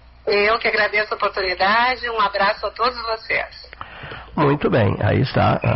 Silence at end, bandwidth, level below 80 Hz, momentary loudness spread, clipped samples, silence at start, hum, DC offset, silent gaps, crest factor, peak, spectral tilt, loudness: 0 s; 6 kHz; -44 dBFS; 15 LU; under 0.1%; 0.25 s; none; under 0.1%; none; 12 dB; -6 dBFS; -3.5 dB/octave; -19 LUFS